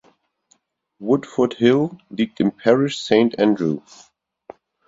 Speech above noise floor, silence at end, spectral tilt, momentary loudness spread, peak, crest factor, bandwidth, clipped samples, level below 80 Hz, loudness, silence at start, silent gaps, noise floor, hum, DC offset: 44 dB; 1.1 s; -6.5 dB/octave; 8 LU; 0 dBFS; 20 dB; 7.8 kHz; under 0.1%; -62 dBFS; -19 LUFS; 1 s; none; -63 dBFS; none; under 0.1%